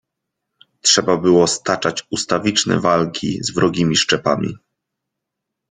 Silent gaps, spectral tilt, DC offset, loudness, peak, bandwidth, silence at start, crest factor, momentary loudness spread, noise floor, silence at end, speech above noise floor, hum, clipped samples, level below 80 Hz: none; -3.5 dB/octave; under 0.1%; -17 LUFS; 0 dBFS; 9.8 kHz; 0.85 s; 18 dB; 8 LU; -80 dBFS; 1.15 s; 63 dB; none; under 0.1%; -54 dBFS